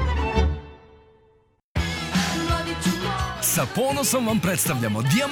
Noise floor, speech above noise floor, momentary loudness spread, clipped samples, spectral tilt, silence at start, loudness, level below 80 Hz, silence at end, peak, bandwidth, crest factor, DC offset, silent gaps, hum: -61 dBFS; 39 dB; 5 LU; under 0.1%; -4 dB/octave; 0 s; -23 LUFS; -32 dBFS; 0 s; -8 dBFS; 18 kHz; 16 dB; under 0.1%; 1.64-1.75 s; none